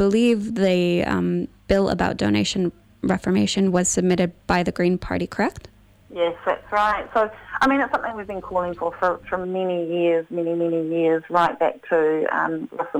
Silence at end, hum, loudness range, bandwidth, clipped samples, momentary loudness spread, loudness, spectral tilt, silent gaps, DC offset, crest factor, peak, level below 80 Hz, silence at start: 0 s; none; 2 LU; 14 kHz; under 0.1%; 7 LU; -22 LUFS; -5 dB/octave; none; under 0.1%; 18 dB; -4 dBFS; -46 dBFS; 0 s